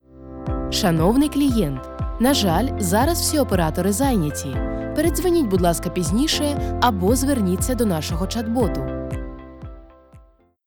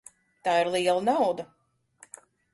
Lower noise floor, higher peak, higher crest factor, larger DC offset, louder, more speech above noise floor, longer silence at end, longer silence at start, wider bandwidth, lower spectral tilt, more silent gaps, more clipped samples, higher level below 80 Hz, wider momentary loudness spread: second, -51 dBFS vs -58 dBFS; first, -4 dBFS vs -12 dBFS; about the same, 18 dB vs 16 dB; first, 0.3% vs under 0.1%; first, -20 LUFS vs -26 LUFS; about the same, 32 dB vs 33 dB; second, 0.5 s vs 1.1 s; second, 0.15 s vs 0.45 s; first, 20 kHz vs 11.5 kHz; about the same, -5 dB/octave vs -4 dB/octave; neither; neither; first, -32 dBFS vs -70 dBFS; second, 11 LU vs 23 LU